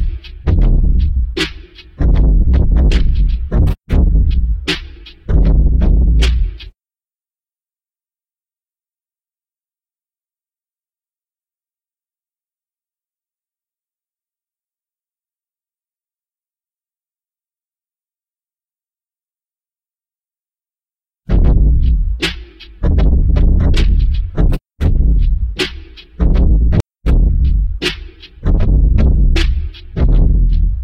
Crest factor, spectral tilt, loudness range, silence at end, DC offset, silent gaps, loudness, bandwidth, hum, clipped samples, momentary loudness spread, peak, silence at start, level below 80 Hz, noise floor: 14 dB; -7 dB/octave; 4 LU; 0 s; under 0.1%; none; -15 LUFS; 8.4 kHz; none; under 0.1%; 8 LU; 0 dBFS; 0 s; -14 dBFS; under -90 dBFS